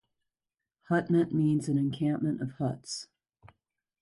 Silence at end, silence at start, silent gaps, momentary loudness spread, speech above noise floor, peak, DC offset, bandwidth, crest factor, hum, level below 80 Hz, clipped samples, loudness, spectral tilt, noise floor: 0.95 s; 0.9 s; none; 12 LU; over 61 dB; -14 dBFS; under 0.1%; 11.5 kHz; 16 dB; none; -68 dBFS; under 0.1%; -30 LUFS; -6.5 dB/octave; under -90 dBFS